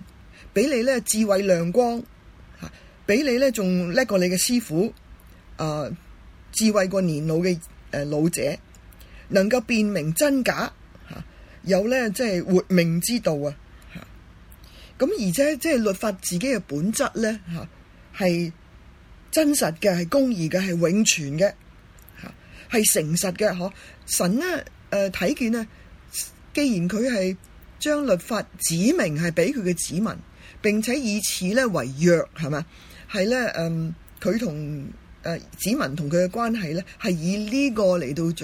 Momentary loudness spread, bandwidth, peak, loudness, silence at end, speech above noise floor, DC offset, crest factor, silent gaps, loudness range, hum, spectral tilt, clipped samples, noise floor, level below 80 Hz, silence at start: 13 LU; 16.5 kHz; -4 dBFS; -23 LUFS; 0 s; 25 dB; under 0.1%; 20 dB; none; 3 LU; none; -4.5 dB/octave; under 0.1%; -48 dBFS; -50 dBFS; 0 s